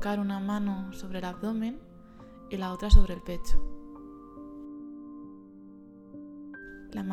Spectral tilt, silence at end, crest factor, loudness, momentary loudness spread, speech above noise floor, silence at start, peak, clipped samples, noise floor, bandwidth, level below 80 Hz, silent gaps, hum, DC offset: -7 dB/octave; 0 s; 24 dB; -32 LUFS; 23 LU; 26 dB; 0 s; -4 dBFS; under 0.1%; -50 dBFS; 8.6 kHz; -30 dBFS; none; none; under 0.1%